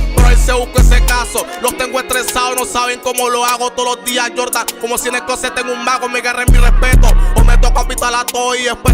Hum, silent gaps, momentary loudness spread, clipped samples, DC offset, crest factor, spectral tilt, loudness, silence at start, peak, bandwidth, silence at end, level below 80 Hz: none; none; 6 LU; under 0.1%; under 0.1%; 10 dB; -3.5 dB/octave; -14 LUFS; 0 s; 0 dBFS; 16.5 kHz; 0 s; -14 dBFS